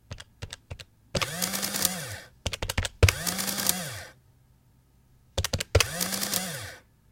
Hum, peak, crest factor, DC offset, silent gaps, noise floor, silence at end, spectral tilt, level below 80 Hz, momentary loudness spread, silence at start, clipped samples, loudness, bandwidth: none; 0 dBFS; 30 dB; under 0.1%; none; -61 dBFS; 0.3 s; -3 dB/octave; -42 dBFS; 19 LU; 0.1 s; under 0.1%; -28 LUFS; 17 kHz